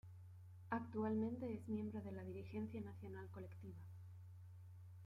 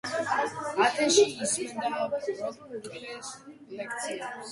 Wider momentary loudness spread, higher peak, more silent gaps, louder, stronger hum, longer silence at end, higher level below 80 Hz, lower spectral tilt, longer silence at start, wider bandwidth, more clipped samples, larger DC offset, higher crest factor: about the same, 17 LU vs 18 LU; second, -28 dBFS vs -8 dBFS; neither; second, -48 LUFS vs -28 LUFS; neither; about the same, 0 s vs 0 s; second, -80 dBFS vs -72 dBFS; first, -9.5 dB/octave vs -2 dB/octave; about the same, 0.05 s vs 0.05 s; about the same, 11.5 kHz vs 11.5 kHz; neither; neither; about the same, 20 dB vs 22 dB